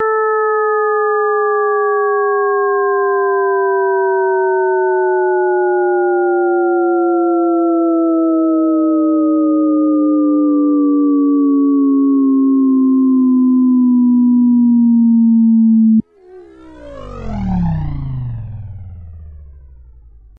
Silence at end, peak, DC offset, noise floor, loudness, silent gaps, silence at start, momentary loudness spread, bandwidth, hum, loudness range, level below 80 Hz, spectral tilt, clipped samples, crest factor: 0.55 s; -6 dBFS; under 0.1%; -40 dBFS; -13 LUFS; none; 0 s; 8 LU; 2.4 kHz; none; 6 LU; -38 dBFS; -11.5 dB/octave; under 0.1%; 8 dB